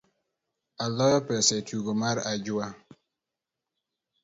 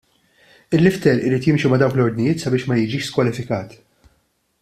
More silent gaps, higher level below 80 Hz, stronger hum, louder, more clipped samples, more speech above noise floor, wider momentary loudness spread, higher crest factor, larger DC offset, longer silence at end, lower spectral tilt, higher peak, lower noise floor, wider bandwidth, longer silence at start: neither; second, -68 dBFS vs -52 dBFS; neither; second, -27 LUFS vs -18 LUFS; neither; first, 61 dB vs 47 dB; about the same, 9 LU vs 9 LU; about the same, 22 dB vs 18 dB; neither; first, 1.5 s vs 0.9 s; second, -3.5 dB/octave vs -7 dB/octave; second, -8 dBFS vs -2 dBFS; first, -88 dBFS vs -65 dBFS; second, 8 kHz vs 14 kHz; about the same, 0.8 s vs 0.7 s